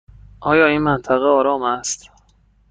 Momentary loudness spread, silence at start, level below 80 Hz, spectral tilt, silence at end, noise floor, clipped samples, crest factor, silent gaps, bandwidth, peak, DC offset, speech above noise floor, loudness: 12 LU; 0.4 s; -46 dBFS; -4.5 dB/octave; 0.75 s; -56 dBFS; under 0.1%; 18 dB; none; 9.6 kHz; -2 dBFS; under 0.1%; 39 dB; -17 LUFS